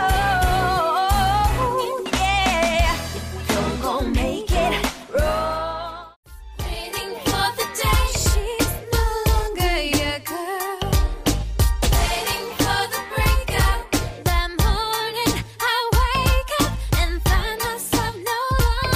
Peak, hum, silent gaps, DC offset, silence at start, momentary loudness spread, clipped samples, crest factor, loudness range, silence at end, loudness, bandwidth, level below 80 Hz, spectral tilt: -6 dBFS; none; 6.16-6.23 s; under 0.1%; 0 s; 7 LU; under 0.1%; 14 dB; 3 LU; 0 s; -21 LUFS; 16 kHz; -26 dBFS; -4 dB/octave